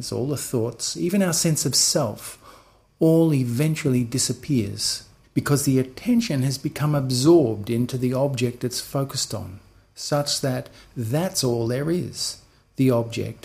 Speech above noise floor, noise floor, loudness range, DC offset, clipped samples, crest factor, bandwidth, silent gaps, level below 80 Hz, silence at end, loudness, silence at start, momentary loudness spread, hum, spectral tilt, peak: 30 dB; -52 dBFS; 4 LU; under 0.1%; under 0.1%; 18 dB; 15.5 kHz; none; -54 dBFS; 0.1 s; -22 LUFS; 0 s; 11 LU; none; -5 dB/octave; -6 dBFS